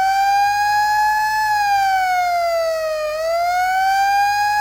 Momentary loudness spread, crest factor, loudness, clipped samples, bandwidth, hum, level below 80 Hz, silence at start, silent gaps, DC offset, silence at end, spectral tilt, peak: 4 LU; 8 dB; -17 LUFS; under 0.1%; 16.5 kHz; none; -50 dBFS; 0 s; none; under 0.1%; 0 s; 0 dB/octave; -8 dBFS